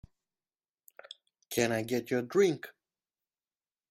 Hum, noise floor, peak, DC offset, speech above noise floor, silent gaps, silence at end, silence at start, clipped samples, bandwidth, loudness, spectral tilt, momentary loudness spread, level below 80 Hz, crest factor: none; under -90 dBFS; -14 dBFS; under 0.1%; over 60 dB; none; 1.2 s; 1.5 s; under 0.1%; 16 kHz; -31 LUFS; -4.5 dB/octave; 23 LU; -70 dBFS; 22 dB